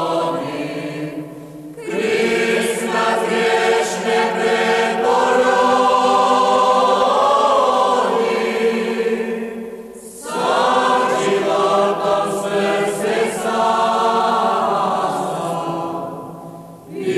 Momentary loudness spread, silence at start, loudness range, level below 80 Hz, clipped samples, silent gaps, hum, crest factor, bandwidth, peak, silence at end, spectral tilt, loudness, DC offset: 15 LU; 0 s; 5 LU; -58 dBFS; under 0.1%; none; none; 14 dB; 14 kHz; -4 dBFS; 0 s; -4 dB/octave; -17 LUFS; under 0.1%